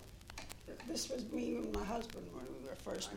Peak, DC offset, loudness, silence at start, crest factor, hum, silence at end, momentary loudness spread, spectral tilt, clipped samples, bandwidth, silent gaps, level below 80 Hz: -26 dBFS; under 0.1%; -44 LUFS; 0 s; 18 dB; none; 0 s; 10 LU; -4 dB/octave; under 0.1%; 17 kHz; none; -56 dBFS